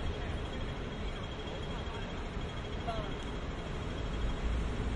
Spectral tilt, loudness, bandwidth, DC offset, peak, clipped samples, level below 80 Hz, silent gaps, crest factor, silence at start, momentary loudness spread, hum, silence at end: -6 dB/octave; -39 LUFS; 11 kHz; under 0.1%; -22 dBFS; under 0.1%; -40 dBFS; none; 16 dB; 0 s; 4 LU; none; 0 s